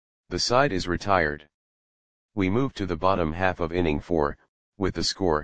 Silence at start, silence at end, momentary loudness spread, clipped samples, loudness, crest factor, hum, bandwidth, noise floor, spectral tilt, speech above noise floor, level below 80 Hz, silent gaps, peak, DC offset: 0.25 s; 0 s; 7 LU; under 0.1%; -25 LUFS; 22 dB; none; 10 kHz; under -90 dBFS; -5 dB/octave; over 65 dB; -44 dBFS; 1.54-2.29 s, 4.49-4.72 s; -4 dBFS; 0.9%